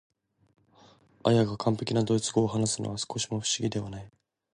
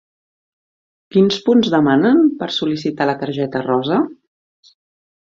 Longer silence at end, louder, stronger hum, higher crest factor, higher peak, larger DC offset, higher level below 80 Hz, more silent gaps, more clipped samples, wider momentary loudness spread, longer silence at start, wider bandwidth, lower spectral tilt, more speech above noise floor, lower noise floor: second, 0.5 s vs 1.2 s; second, -28 LUFS vs -16 LUFS; neither; first, 22 dB vs 16 dB; second, -8 dBFS vs -2 dBFS; neither; about the same, -60 dBFS vs -60 dBFS; neither; neither; about the same, 8 LU vs 8 LU; about the same, 1.25 s vs 1.15 s; first, 11 kHz vs 7.6 kHz; second, -5 dB/octave vs -6.5 dB/octave; second, 31 dB vs over 75 dB; second, -59 dBFS vs under -90 dBFS